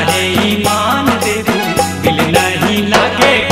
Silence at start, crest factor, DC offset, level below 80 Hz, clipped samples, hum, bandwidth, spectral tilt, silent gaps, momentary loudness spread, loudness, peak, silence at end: 0 s; 12 dB; under 0.1%; -38 dBFS; under 0.1%; none; 16.5 kHz; -4 dB/octave; none; 4 LU; -12 LUFS; 0 dBFS; 0 s